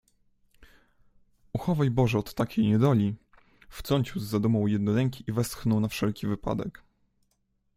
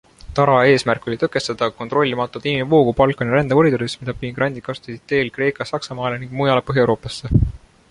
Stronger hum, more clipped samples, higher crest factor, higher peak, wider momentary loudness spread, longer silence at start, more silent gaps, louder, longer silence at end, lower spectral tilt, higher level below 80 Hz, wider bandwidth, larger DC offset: neither; neither; about the same, 20 dB vs 18 dB; second, -10 dBFS vs -2 dBFS; about the same, 10 LU vs 11 LU; first, 1.55 s vs 0.25 s; neither; second, -27 LUFS vs -19 LUFS; first, 1.05 s vs 0.35 s; about the same, -7 dB/octave vs -6.5 dB/octave; second, -52 dBFS vs -36 dBFS; first, 16 kHz vs 11 kHz; neither